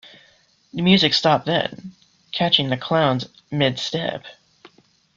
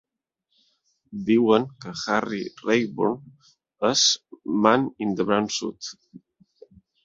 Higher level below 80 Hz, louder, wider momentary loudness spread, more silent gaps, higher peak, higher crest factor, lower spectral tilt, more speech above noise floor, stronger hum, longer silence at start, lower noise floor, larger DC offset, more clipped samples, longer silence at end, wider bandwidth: first, -58 dBFS vs -64 dBFS; first, -20 LUFS vs -23 LUFS; about the same, 14 LU vs 14 LU; neither; about the same, -2 dBFS vs -2 dBFS; about the same, 20 dB vs 24 dB; first, -5.5 dB/octave vs -3.5 dB/octave; second, 38 dB vs 55 dB; neither; second, 0.05 s vs 1.1 s; second, -57 dBFS vs -78 dBFS; neither; neither; about the same, 0.85 s vs 0.85 s; about the same, 7.6 kHz vs 7.8 kHz